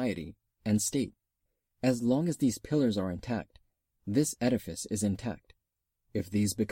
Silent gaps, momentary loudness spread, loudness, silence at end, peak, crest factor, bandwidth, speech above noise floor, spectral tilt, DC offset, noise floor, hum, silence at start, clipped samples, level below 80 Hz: none; 11 LU; -31 LUFS; 0.05 s; -14 dBFS; 18 dB; 16.5 kHz; 53 dB; -5.5 dB/octave; under 0.1%; -84 dBFS; none; 0 s; under 0.1%; -58 dBFS